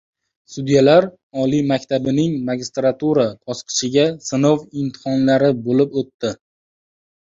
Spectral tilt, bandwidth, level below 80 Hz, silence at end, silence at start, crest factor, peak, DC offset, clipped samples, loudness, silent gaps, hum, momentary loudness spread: -5.5 dB/octave; 7.8 kHz; -58 dBFS; 0.95 s; 0.5 s; 16 dB; -2 dBFS; under 0.1%; under 0.1%; -18 LUFS; 1.23-1.30 s, 6.14-6.19 s; none; 11 LU